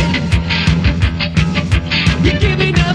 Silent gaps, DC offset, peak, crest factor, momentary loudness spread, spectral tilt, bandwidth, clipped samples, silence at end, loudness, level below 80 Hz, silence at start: none; under 0.1%; 0 dBFS; 12 dB; 3 LU; -6 dB/octave; 10.5 kHz; under 0.1%; 0 s; -14 LUFS; -20 dBFS; 0 s